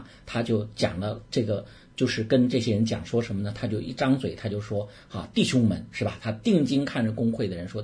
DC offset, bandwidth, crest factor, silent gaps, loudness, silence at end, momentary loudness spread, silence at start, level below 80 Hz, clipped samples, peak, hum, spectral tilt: under 0.1%; 10.5 kHz; 18 dB; none; -27 LUFS; 0 s; 10 LU; 0 s; -54 dBFS; under 0.1%; -10 dBFS; none; -6.5 dB/octave